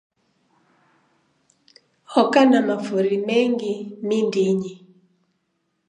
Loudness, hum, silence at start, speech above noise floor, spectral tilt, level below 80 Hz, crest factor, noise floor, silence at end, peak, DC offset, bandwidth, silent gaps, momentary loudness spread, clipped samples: -20 LUFS; none; 2.1 s; 53 dB; -6 dB/octave; -76 dBFS; 20 dB; -72 dBFS; 1.1 s; -2 dBFS; under 0.1%; 10 kHz; none; 11 LU; under 0.1%